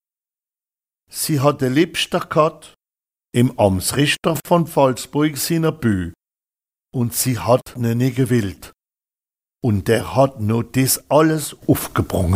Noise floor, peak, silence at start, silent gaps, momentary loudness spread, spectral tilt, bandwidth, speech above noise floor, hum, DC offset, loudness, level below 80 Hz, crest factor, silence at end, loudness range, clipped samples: under -90 dBFS; -2 dBFS; 1.15 s; none; 7 LU; -5 dB/octave; 16 kHz; over 72 dB; none; under 0.1%; -18 LUFS; -46 dBFS; 18 dB; 0 s; 3 LU; under 0.1%